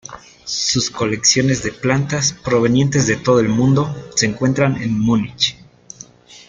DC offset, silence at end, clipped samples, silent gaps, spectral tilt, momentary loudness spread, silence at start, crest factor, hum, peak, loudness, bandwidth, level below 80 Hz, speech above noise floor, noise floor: under 0.1%; 0.1 s; under 0.1%; none; -4 dB/octave; 7 LU; 0.1 s; 18 dB; none; 0 dBFS; -16 LUFS; 9.6 kHz; -46 dBFS; 25 dB; -41 dBFS